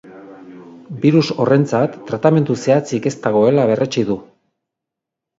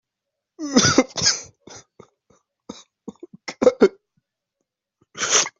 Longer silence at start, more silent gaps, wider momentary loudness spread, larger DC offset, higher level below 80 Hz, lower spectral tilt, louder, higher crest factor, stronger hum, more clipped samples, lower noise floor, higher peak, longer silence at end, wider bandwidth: second, 0.05 s vs 0.6 s; neither; second, 7 LU vs 25 LU; neither; about the same, -60 dBFS vs -58 dBFS; first, -7 dB/octave vs -2.5 dB/octave; first, -16 LUFS vs -19 LUFS; second, 16 dB vs 22 dB; neither; neither; about the same, -83 dBFS vs -83 dBFS; about the same, 0 dBFS vs -2 dBFS; first, 1.15 s vs 0.1 s; about the same, 8 kHz vs 8.2 kHz